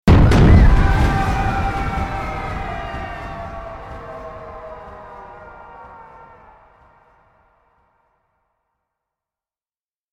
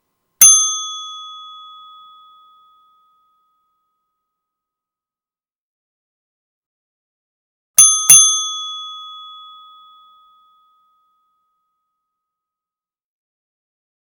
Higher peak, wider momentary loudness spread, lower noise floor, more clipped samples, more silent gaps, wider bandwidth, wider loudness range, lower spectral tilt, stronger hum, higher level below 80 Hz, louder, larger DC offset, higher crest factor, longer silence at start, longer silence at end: about the same, -2 dBFS vs 0 dBFS; about the same, 27 LU vs 27 LU; about the same, under -90 dBFS vs under -90 dBFS; second, under 0.1% vs 0.1%; second, none vs 5.56-7.74 s; second, 11 kHz vs over 20 kHz; first, 25 LU vs 19 LU; first, -7.5 dB/octave vs 3.5 dB/octave; neither; first, -22 dBFS vs -74 dBFS; second, -17 LUFS vs -9 LUFS; neither; about the same, 18 dB vs 20 dB; second, 0.05 s vs 0.4 s; second, 4.2 s vs 4.95 s